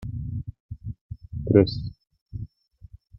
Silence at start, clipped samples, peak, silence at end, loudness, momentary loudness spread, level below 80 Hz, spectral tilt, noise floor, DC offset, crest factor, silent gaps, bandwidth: 0 s; under 0.1%; -2 dBFS; 0.25 s; -24 LUFS; 21 LU; -44 dBFS; -10 dB/octave; -50 dBFS; under 0.1%; 24 dB; 0.60-0.69 s, 1.01-1.09 s, 2.21-2.26 s; 5.8 kHz